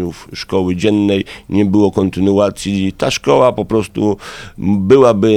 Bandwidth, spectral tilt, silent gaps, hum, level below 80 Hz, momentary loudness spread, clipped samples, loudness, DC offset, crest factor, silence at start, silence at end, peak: 13.5 kHz; -6.5 dB/octave; none; none; -42 dBFS; 10 LU; under 0.1%; -14 LUFS; under 0.1%; 14 dB; 0 s; 0 s; 0 dBFS